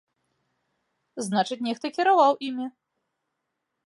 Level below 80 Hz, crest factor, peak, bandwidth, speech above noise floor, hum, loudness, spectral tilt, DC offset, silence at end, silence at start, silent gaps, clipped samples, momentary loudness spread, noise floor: -82 dBFS; 20 dB; -8 dBFS; 11.5 kHz; 57 dB; none; -24 LUFS; -4.5 dB/octave; under 0.1%; 1.2 s; 1.15 s; none; under 0.1%; 16 LU; -81 dBFS